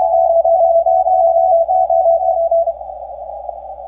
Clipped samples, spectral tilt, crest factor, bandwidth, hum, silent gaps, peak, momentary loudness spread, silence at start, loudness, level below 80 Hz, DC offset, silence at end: under 0.1%; -9 dB/octave; 8 dB; 1.2 kHz; none; none; -4 dBFS; 16 LU; 0 s; -13 LUFS; -46 dBFS; under 0.1%; 0 s